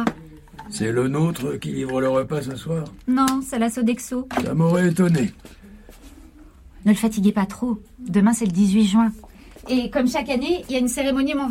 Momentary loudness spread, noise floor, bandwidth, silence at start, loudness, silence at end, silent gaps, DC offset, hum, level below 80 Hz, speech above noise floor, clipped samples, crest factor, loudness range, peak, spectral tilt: 9 LU; -46 dBFS; 16.5 kHz; 0 s; -21 LUFS; 0 s; none; under 0.1%; none; -48 dBFS; 25 dB; under 0.1%; 18 dB; 3 LU; -4 dBFS; -6 dB/octave